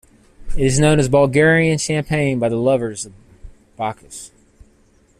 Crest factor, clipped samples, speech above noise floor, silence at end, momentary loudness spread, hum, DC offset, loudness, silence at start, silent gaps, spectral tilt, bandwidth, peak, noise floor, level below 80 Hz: 16 dB; under 0.1%; 38 dB; 0.9 s; 20 LU; none; under 0.1%; -17 LUFS; 0.4 s; none; -5.5 dB/octave; 13.5 kHz; -2 dBFS; -54 dBFS; -34 dBFS